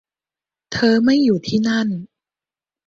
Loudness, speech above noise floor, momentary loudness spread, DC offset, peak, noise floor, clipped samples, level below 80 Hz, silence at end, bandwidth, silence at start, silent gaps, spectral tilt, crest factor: -17 LUFS; over 74 dB; 12 LU; under 0.1%; -4 dBFS; under -90 dBFS; under 0.1%; -56 dBFS; 0.85 s; 7.6 kHz; 0.7 s; none; -5.5 dB/octave; 16 dB